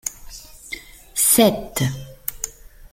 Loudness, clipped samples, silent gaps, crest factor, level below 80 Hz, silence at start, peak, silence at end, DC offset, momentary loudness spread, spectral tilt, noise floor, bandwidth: -19 LUFS; under 0.1%; none; 22 dB; -44 dBFS; 0.05 s; 0 dBFS; 0.05 s; under 0.1%; 23 LU; -3.5 dB/octave; -39 dBFS; 16.5 kHz